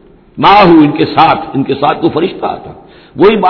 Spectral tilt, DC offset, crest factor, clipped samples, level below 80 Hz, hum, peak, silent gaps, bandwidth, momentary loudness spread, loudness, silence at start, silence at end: -8 dB/octave; under 0.1%; 10 dB; 2%; -40 dBFS; none; 0 dBFS; none; 5.4 kHz; 12 LU; -9 LUFS; 0.35 s; 0 s